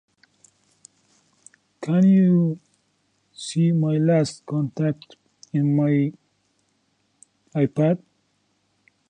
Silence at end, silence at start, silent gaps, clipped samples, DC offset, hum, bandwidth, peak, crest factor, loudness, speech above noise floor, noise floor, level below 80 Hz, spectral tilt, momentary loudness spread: 1.1 s; 1.8 s; none; under 0.1%; under 0.1%; none; 9.8 kHz; -8 dBFS; 16 dB; -21 LUFS; 49 dB; -68 dBFS; -68 dBFS; -8 dB/octave; 13 LU